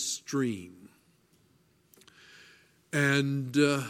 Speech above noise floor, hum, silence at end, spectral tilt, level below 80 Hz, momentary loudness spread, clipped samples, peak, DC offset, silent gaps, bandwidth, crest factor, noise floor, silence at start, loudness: 39 dB; none; 0 s; -4.5 dB/octave; -72 dBFS; 12 LU; under 0.1%; -10 dBFS; under 0.1%; none; 16 kHz; 22 dB; -66 dBFS; 0 s; -29 LUFS